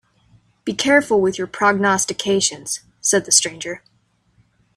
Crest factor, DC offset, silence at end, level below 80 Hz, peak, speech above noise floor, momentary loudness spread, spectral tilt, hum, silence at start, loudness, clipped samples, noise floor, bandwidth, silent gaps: 20 dB; under 0.1%; 1 s; -58 dBFS; 0 dBFS; 44 dB; 14 LU; -2 dB/octave; none; 0.65 s; -17 LUFS; under 0.1%; -62 dBFS; 15 kHz; none